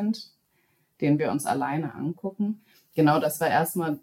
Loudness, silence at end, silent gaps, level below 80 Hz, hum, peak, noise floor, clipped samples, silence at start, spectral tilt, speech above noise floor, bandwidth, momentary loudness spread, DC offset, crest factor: -26 LUFS; 0.05 s; none; -74 dBFS; none; -8 dBFS; -69 dBFS; under 0.1%; 0 s; -6 dB/octave; 43 dB; 17 kHz; 11 LU; under 0.1%; 18 dB